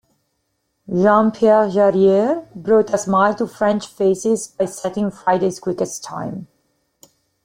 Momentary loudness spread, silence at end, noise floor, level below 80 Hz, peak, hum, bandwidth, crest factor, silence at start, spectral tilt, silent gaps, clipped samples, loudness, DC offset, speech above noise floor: 11 LU; 1 s; -70 dBFS; -60 dBFS; -2 dBFS; none; 15.5 kHz; 16 dB; 0.9 s; -6 dB/octave; none; under 0.1%; -18 LUFS; under 0.1%; 53 dB